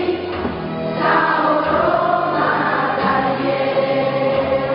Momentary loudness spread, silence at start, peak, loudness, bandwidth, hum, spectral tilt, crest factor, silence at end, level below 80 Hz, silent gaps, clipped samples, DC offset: 7 LU; 0 s; -2 dBFS; -17 LUFS; 5.4 kHz; none; -9 dB/octave; 16 dB; 0 s; -46 dBFS; none; under 0.1%; under 0.1%